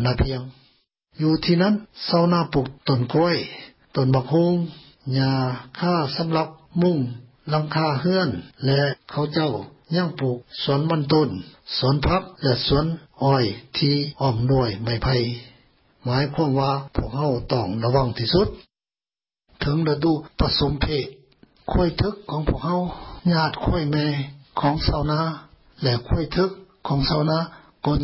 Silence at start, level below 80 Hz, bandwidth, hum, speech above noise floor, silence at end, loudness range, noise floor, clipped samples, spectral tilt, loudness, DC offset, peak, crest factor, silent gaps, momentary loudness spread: 0 s; -38 dBFS; 5.8 kHz; none; over 68 dB; 0 s; 2 LU; under -90 dBFS; under 0.1%; -10.5 dB/octave; -23 LUFS; under 0.1%; -6 dBFS; 16 dB; none; 8 LU